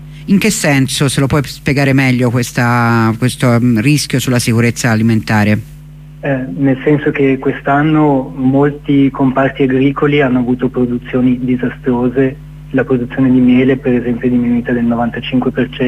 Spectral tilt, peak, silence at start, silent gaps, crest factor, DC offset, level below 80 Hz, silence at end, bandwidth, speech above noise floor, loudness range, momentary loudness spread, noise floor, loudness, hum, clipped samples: -6 dB/octave; 0 dBFS; 0 s; none; 12 dB; under 0.1%; -38 dBFS; 0 s; 15.5 kHz; 21 dB; 2 LU; 5 LU; -33 dBFS; -13 LUFS; none; under 0.1%